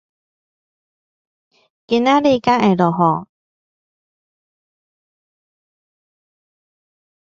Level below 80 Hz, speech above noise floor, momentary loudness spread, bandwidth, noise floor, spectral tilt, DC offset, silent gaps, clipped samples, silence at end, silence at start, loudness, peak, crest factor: -60 dBFS; over 76 dB; 5 LU; 7.4 kHz; under -90 dBFS; -7 dB/octave; under 0.1%; none; under 0.1%; 4.15 s; 1.9 s; -16 LUFS; 0 dBFS; 22 dB